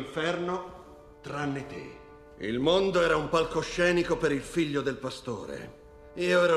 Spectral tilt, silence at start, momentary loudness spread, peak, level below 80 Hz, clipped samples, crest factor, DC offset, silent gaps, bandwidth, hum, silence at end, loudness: -5 dB/octave; 0 s; 20 LU; -10 dBFS; -52 dBFS; under 0.1%; 18 dB; under 0.1%; none; 13 kHz; none; 0 s; -28 LUFS